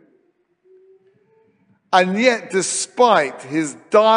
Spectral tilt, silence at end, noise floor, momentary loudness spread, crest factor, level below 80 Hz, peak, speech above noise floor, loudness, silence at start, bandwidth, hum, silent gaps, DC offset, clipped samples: -3.5 dB/octave; 0 s; -63 dBFS; 9 LU; 18 dB; -70 dBFS; 0 dBFS; 46 dB; -18 LUFS; 1.9 s; 10 kHz; none; none; under 0.1%; under 0.1%